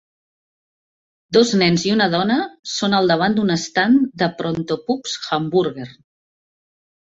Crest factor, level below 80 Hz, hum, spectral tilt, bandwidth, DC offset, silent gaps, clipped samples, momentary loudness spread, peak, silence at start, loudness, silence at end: 18 dB; -58 dBFS; none; -5 dB/octave; 8 kHz; under 0.1%; 2.59-2.63 s; under 0.1%; 8 LU; -2 dBFS; 1.3 s; -18 LUFS; 1.1 s